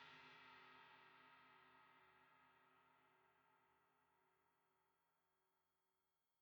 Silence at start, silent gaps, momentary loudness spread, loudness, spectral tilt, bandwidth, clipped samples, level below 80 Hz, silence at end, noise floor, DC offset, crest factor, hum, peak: 0 s; none; 6 LU; -66 LUFS; -3 dB/octave; 19.5 kHz; under 0.1%; under -90 dBFS; 0 s; under -90 dBFS; under 0.1%; 22 dB; none; -50 dBFS